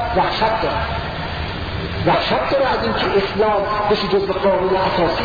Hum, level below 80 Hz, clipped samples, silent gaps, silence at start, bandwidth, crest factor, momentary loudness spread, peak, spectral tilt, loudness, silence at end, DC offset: none; -34 dBFS; under 0.1%; none; 0 s; 5 kHz; 14 dB; 8 LU; -4 dBFS; -7 dB/octave; -18 LUFS; 0 s; under 0.1%